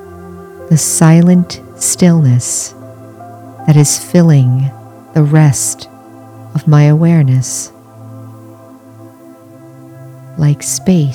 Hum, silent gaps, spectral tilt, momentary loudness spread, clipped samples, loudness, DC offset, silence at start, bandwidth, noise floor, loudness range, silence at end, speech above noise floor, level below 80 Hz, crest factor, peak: none; none; -6 dB/octave; 24 LU; 0.1%; -10 LUFS; under 0.1%; 0 s; 16.5 kHz; -36 dBFS; 7 LU; 0 s; 28 dB; -50 dBFS; 12 dB; 0 dBFS